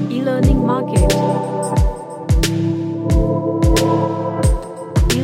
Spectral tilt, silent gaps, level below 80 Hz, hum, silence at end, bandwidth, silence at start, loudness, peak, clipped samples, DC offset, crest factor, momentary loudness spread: -6 dB/octave; none; -22 dBFS; none; 0 s; 16.5 kHz; 0 s; -17 LUFS; 0 dBFS; under 0.1%; under 0.1%; 16 dB; 5 LU